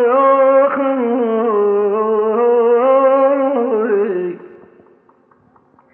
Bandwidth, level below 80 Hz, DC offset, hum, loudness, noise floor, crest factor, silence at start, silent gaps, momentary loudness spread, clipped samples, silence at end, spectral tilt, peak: 3.5 kHz; -78 dBFS; under 0.1%; none; -14 LUFS; -52 dBFS; 12 dB; 0 s; none; 6 LU; under 0.1%; 1.4 s; -10 dB/octave; -2 dBFS